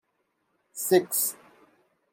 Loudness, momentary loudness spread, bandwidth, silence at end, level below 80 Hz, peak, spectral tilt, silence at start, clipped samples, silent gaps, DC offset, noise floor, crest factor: -25 LUFS; 21 LU; 16.5 kHz; 0.8 s; -78 dBFS; -8 dBFS; -3.5 dB/octave; 0.75 s; under 0.1%; none; under 0.1%; -75 dBFS; 22 dB